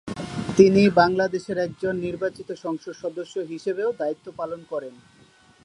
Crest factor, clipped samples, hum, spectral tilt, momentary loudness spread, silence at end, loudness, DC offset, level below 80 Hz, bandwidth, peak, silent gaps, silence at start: 22 dB; under 0.1%; none; -6.5 dB/octave; 16 LU; 0.7 s; -24 LUFS; under 0.1%; -56 dBFS; 11 kHz; -2 dBFS; none; 0.05 s